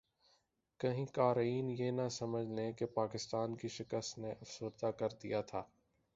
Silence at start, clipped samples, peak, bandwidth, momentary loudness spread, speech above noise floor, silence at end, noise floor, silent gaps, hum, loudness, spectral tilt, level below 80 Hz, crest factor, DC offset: 0.8 s; under 0.1%; -20 dBFS; 7.6 kHz; 11 LU; 39 dB; 0.5 s; -78 dBFS; none; none; -40 LUFS; -6 dB/octave; -74 dBFS; 20 dB; under 0.1%